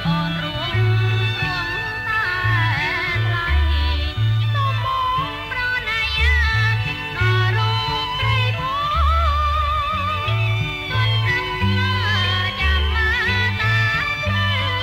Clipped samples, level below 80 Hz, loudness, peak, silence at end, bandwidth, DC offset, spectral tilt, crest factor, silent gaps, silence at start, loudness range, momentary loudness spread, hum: under 0.1%; -26 dBFS; -19 LUFS; -6 dBFS; 0 s; 15 kHz; under 0.1%; -5.5 dB/octave; 12 dB; none; 0 s; 1 LU; 4 LU; none